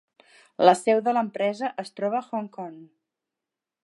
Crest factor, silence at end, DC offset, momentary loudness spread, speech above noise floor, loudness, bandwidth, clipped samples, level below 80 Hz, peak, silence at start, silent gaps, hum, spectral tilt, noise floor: 24 dB; 1 s; under 0.1%; 18 LU; 64 dB; -24 LUFS; 11.5 kHz; under 0.1%; -82 dBFS; -2 dBFS; 0.6 s; none; none; -5 dB/octave; -88 dBFS